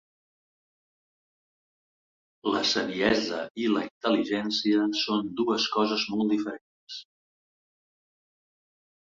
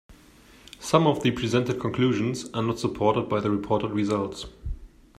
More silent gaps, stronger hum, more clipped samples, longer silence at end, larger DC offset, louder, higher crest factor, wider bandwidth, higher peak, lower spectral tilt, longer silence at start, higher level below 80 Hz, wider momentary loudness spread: first, 3.50-3.55 s, 3.91-4.01 s, 6.61-6.87 s vs none; neither; neither; first, 2.15 s vs 0.35 s; neither; about the same, -27 LUFS vs -25 LUFS; about the same, 20 dB vs 20 dB; second, 7.6 kHz vs 14.5 kHz; second, -10 dBFS vs -6 dBFS; second, -4 dB/octave vs -6 dB/octave; first, 2.45 s vs 0.1 s; second, -66 dBFS vs -46 dBFS; second, 12 LU vs 16 LU